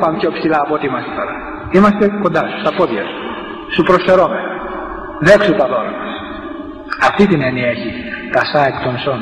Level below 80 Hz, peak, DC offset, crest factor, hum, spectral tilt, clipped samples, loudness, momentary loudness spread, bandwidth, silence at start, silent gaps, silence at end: -42 dBFS; 0 dBFS; under 0.1%; 14 dB; none; -6.5 dB/octave; under 0.1%; -15 LUFS; 15 LU; 10.5 kHz; 0 s; none; 0 s